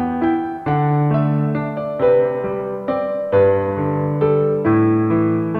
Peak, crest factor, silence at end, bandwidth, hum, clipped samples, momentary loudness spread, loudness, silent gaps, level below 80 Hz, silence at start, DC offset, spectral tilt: -4 dBFS; 14 dB; 0 s; 4.5 kHz; none; under 0.1%; 7 LU; -18 LUFS; none; -48 dBFS; 0 s; under 0.1%; -11 dB/octave